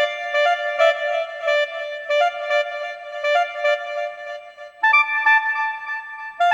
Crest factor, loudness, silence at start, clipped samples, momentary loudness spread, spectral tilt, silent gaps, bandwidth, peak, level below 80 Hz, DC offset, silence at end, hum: 16 dB; -20 LUFS; 0 s; under 0.1%; 14 LU; 1.5 dB/octave; none; 12 kHz; -4 dBFS; -76 dBFS; under 0.1%; 0 s; none